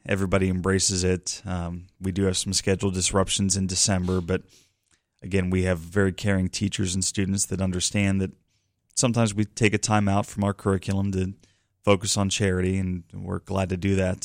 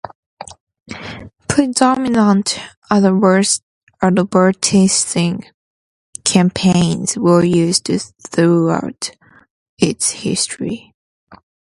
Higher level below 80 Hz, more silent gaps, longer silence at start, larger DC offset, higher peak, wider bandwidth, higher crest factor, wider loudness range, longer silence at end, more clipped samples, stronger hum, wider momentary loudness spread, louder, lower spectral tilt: about the same, -48 dBFS vs -50 dBFS; second, none vs 0.15-0.37 s, 0.60-0.67 s, 2.77-2.82 s, 3.63-3.87 s, 5.54-6.13 s, 9.50-9.77 s, 10.94-11.27 s; about the same, 0.05 s vs 0.05 s; neither; second, -6 dBFS vs 0 dBFS; first, 16 kHz vs 11.5 kHz; about the same, 20 dB vs 16 dB; about the same, 2 LU vs 4 LU; second, 0.05 s vs 0.45 s; neither; neither; second, 9 LU vs 18 LU; second, -25 LUFS vs -15 LUFS; about the same, -4.5 dB/octave vs -4.5 dB/octave